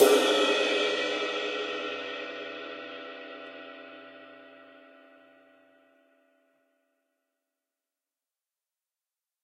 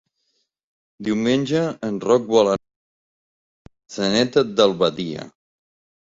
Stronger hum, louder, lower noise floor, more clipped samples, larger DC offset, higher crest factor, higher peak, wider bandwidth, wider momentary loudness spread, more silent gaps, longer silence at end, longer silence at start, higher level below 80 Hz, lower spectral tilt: neither; second, -28 LUFS vs -20 LUFS; first, under -90 dBFS vs -71 dBFS; neither; neither; first, 26 dB vs 20 dB; second, -6 dBFS vs -2 dBFS; first, 15.5 kHz vs 7.8 kHz; first, 24 LU vs 12 LU; second, none vs 2.76-3.65 s; first, 4.65 s vs 0.75 s; second, 0 s vs 1 s; second, under -90 dBFS vs -58 dBFS; second, -1 dB/octave vs -5 dB/octave